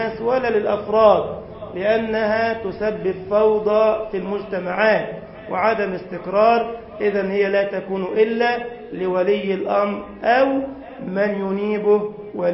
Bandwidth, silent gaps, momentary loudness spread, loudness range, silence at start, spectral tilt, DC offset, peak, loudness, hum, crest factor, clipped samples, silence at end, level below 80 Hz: 5.8 kHz; none; 11 LU; 2 LU; 0 s; -10.5 dB/octave; under 0.1%; -2 dBFS; -20 LUFS; none; 18 dB; under 0.1%; 0 s; -52 dBFS